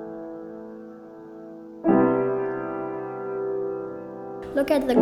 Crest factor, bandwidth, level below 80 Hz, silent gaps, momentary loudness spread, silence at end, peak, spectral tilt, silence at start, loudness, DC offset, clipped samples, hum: 20 dB; 15.5 kHz; -58 dBFS; none; 21 LU; 0 s; -6 dBFS; -7.5 dB/octave; 0 s; -26 LUFS; under 0.1%; under 0.1%; none